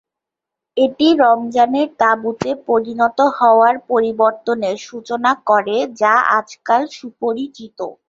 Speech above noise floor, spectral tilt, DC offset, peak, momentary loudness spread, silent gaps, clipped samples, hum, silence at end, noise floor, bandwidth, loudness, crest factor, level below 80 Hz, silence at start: 68 dB; -4.5 dB/octave; under 0.1%; -2 dBFS; 13 LU; none; under 0.1%; none; 0.15 s; -84 dBFS; 7.6 kHz; -16 LUFS; 14 dB; -60 dBFS; 0.75 s